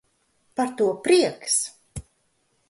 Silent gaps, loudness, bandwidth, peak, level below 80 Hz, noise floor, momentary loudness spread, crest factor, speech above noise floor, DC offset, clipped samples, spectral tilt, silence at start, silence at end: none; -22 LUFS; 11.5 kHz; -6 dBFS; -54 dBFS; -69 dBFS; 21 LU; 18 dB; 47 dB; under 0.1%; under 0.1%; -3 dB/octave; 0.6 s; 0.7 s